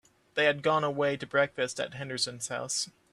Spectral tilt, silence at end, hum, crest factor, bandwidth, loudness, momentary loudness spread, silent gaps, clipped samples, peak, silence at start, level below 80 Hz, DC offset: -3 dB/octave; 0.25 s; none; 18 dB; 13 kHz; -30 LUFS; 9 LU; none; under 0.1%; -12 dBFS; 0.35 s; -72 dBFS; under 0.1%